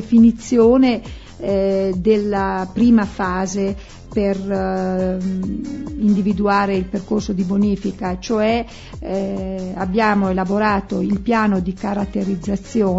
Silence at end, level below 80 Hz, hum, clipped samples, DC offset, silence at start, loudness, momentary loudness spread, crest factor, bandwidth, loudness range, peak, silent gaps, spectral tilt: 0 s; -38 dBFS; none; under 0.1%; under 0.1%; 0 s; -19 LUFS; 11 LU; 16 dB; 8 kHz; 4 LU; -2 dBFS; none; -7 dB/octave